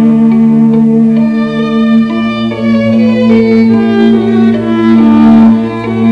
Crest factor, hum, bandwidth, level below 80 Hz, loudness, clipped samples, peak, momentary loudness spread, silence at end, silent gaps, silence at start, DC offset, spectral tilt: 6 dB; none; 5.4 kHz; -42 dBFS; -8 LUFS; 2%; 0 dBFS; 7 LU; 0 s; none; 0 s; under 0.1%; -8.5 dB/octave